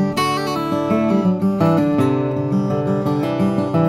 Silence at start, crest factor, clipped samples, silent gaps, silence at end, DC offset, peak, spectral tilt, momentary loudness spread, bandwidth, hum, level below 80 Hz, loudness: 0 s; 14 dB; under 0.1%; none; 0 s; under 0.1%; -4 dBFS; -7.5 dB/octave; 4 LU; 15.5 kHz; none; -50 dBFS; -18 LUFS